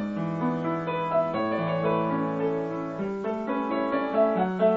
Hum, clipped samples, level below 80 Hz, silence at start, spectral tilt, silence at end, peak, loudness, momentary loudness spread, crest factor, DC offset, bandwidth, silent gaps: none; under 0.1%; -62 dBFS; 0 s; -9 dB/octave; 0 s; -10 dBFS; -27 LUFS; 6 LU; 16 dB; under 0.1%; 7.4 kHz; none